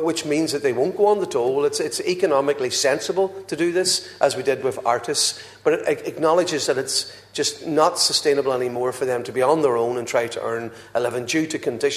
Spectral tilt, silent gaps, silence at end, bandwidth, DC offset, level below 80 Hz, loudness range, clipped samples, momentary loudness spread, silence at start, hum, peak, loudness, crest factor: -3 dB/octave; none; 0 s; 14 kHz; under 0.1%; -66 dBFS; 1 LU; under 0.1%; 6 LU; 0 s; none; -4 dBFS; -21 LUFS; 18 dB